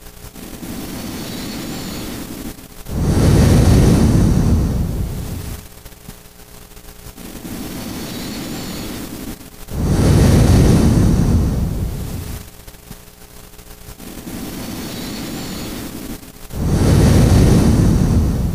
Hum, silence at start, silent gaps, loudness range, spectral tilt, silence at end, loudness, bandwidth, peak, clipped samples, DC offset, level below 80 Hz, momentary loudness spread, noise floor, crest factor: 60 Hz at -35 dBFS; 0 s; none; 14 LU; -6.5 dB/octave; 0 s; -17 LUFS; 16 kHz; -2 dBFS; under 0.1%; 0.3%; -22 dBFS; 23 LU; -39 dBFS; 16 dB